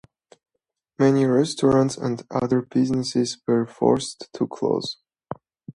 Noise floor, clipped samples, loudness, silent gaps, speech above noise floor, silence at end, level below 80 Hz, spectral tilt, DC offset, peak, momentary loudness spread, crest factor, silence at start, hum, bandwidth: -81 dBFS; under 0.1%; -22 LUFS; none; 59 dB; 0.05 s; -58 dBFS; -6 dB/octave; under 0.1%; -4 dBFS; 16 LU; 20 dB; 1 s; none; 11.5 kHz